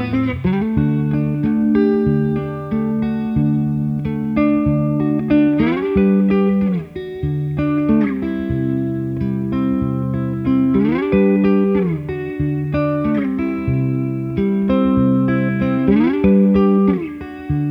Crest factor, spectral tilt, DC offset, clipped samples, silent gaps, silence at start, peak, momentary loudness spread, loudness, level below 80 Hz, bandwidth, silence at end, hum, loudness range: 14 dB; -10.5 dB/octave; under 0.1%; under 0.1%; none; 0 s; -2 dBFS; 7 LU; -17 LUFS; -38 dBFS; 5.2 kHz; 0 s; none; 3 LU